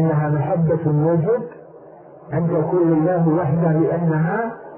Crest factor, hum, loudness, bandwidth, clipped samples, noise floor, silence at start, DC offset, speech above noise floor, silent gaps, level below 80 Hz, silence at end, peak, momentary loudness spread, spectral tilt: 12 dB; none; -19 LUFS; 2.9 kHz; under 0.1%; -42 dBFS; 0 s; under 0.1%; 24 dB; none; -54 dBFS; 0 s; -6 dBFS; 6 LU; -14.5 dB/octave